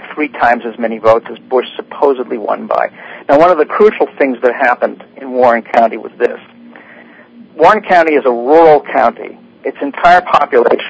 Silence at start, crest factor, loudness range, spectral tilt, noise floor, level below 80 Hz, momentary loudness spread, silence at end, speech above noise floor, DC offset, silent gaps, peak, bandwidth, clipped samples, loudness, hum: 0 s; 12 dB; 4 LU; -6 dB/octave; -38 dBFS; -50 dBFS; 12 LU; 0 s; 27 dB; under 0.1%; none; 0 dBFS; 8 kHz; 1%; -11 LUFS; none